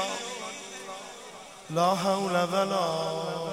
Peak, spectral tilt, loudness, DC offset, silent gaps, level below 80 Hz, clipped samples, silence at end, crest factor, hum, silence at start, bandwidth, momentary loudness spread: -12 dBFS; -4 dB/octave; -29 LUFS; under 0.1%; none; -72 dBFS; under 0.1%; 0 s; 18 dB; none; 0 s; 16 kHz; 17 LU